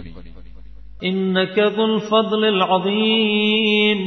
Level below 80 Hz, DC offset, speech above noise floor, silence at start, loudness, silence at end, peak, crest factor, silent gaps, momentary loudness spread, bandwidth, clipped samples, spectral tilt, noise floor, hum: -46 dBFS; under 0.1%; 23 dB; 0 s; -17 LUFS; 0 s; -4 dBFS; 14 dB; none; 5 LU; 6.2 kHz; under 0.1%; -6.5 dB/octave; -40 dBFS; none